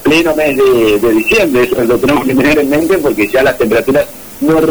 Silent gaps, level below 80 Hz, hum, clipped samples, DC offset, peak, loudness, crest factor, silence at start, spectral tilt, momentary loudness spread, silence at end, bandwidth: none; -36 dBFS; none; under 0.1%; 0.7%; -4 dBFS; -10 LUFS; 6 dB; 0 s; -5 dB/octave; 3 LU; 0 s; over 20 kHz